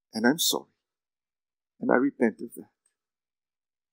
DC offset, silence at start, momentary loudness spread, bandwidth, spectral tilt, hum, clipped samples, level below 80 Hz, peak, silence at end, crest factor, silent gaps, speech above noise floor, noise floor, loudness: under 0.1%; 0.15 s; 15 LU; 16 kHz; -3 dB/octave; none; under 0.1%; -88 dBFS; -4 dBFS; 1.3 s; 26 dB; none; over 64 dB; under -90 dBFS; -26 LUFS